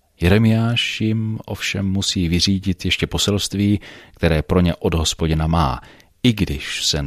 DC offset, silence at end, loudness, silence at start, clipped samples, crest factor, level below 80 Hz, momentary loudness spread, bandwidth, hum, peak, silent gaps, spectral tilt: under 0.1%; 0 s; -19 LUFS; 0.2 s; under 0.1%; 18 dB; -32 dBFS; 6 LU; 15 kHz; none; -2 dBFS; none; -5 dB/octave